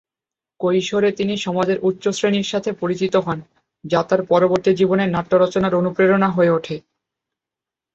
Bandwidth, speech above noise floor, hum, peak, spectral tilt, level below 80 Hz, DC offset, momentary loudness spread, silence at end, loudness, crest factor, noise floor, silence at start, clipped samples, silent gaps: 8 kHz; 71 dB; none; -2 dBFS; -6 dB/octave; -58 dBFS; under 0.1%; 7 LU; 1.15 s; -18 LUFS; 16 dB; -88 dBFS; 0.6 s; under 0.1%; none